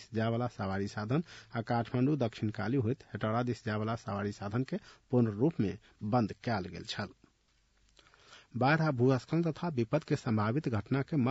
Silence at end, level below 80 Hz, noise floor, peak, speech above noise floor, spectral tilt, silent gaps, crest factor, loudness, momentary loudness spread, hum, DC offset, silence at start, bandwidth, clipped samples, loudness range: 0 s; -66 dBFS; -71 dBFS; -16 dBFS; 39 dB; -7.5 dB/octave; none; 16 dB; -33 LUFS; 10 LU; none; under 0.1%; 0 s; 8 kHz; under 0.1%; 3 LU